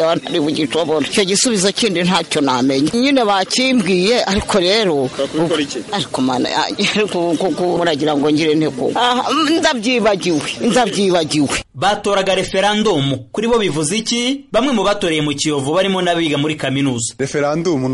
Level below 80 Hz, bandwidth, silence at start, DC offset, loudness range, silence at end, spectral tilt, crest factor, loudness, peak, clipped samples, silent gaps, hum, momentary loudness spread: -46 dBFS; 11.5 kHz; 0 s; under 0.1%; 2 LU; 0 s; -4 dB/octave; 12 dB; -16 LUFS; -2 dBFS; under 0.1%; none; none; 4 LU